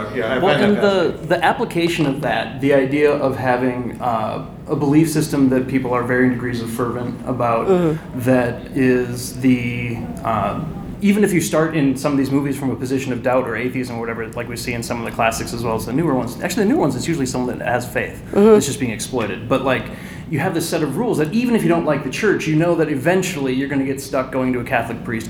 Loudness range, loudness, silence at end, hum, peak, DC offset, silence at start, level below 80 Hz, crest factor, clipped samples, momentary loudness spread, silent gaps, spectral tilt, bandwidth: 3 LU; -19 LUFS; 0 s; none; -2 dBFS; under 0.1%; 0 s; -42 dBFS; 16 dB; under 0.1%; 9 LU; none; -6 dB/octave; 18 kHz